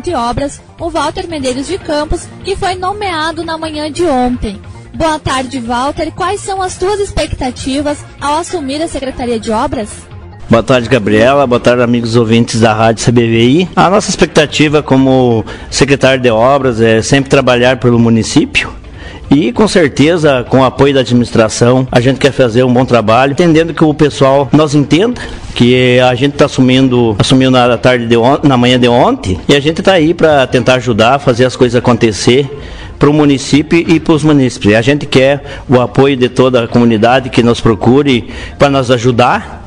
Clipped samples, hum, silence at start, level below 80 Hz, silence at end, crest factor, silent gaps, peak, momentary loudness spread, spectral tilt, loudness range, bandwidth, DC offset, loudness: 0.3%; none; 0.05 s; -32 dBFS; 0 s; 10 dB; none; 0 dBFS; 9 LU; -5.5 dB/octave; 7 LU; 11 kHz; under 0.1%; -10 LUFS